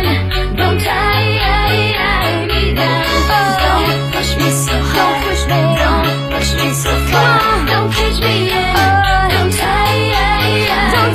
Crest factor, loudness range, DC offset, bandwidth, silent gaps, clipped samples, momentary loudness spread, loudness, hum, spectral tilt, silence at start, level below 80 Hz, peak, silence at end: 12 dB; 1 LU; under 0.1%; 15.5 kHz; none; under 0.1%; 3 LU; -13 LUFS; none; -4.5 dB/octave; 0 s; -22 dBFS; 0 dBFS; 0 s